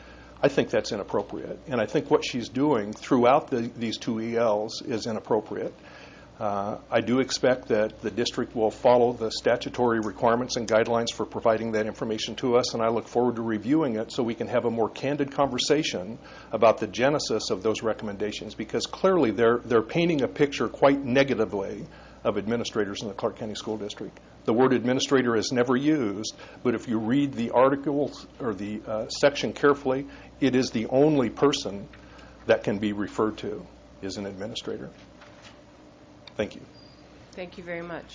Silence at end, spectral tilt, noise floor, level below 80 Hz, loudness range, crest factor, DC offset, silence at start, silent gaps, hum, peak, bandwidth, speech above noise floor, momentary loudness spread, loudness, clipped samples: 0 s; -5 dB/octave; -51 dBFS; -56 dBFS; 6 LU; 20 dB; under 0.1%; 0 s; none; none; -6 dBFS; 7.6 kHz; 25 dB; 13 LU; -26 LUFS; under 0.1%